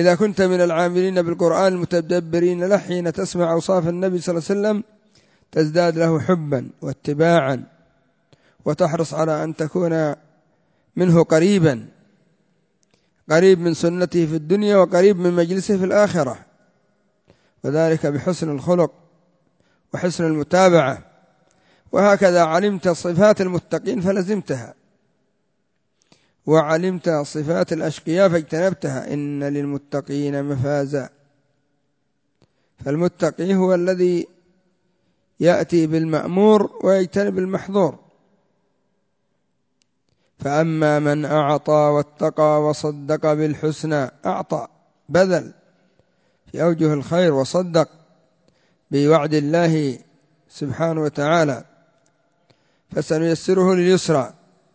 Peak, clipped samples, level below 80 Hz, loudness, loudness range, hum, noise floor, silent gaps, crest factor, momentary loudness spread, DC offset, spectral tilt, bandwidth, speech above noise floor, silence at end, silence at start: -2 dBFS; under 0.1%; -58 dBFS; -19 LUFS; 6 LU; none; -71 dBFS; none; 18 dB; 11 LU; under 0.1%; -6.5 dB/octave; 8 kHz; 53 dB; 0.45 s; 0 s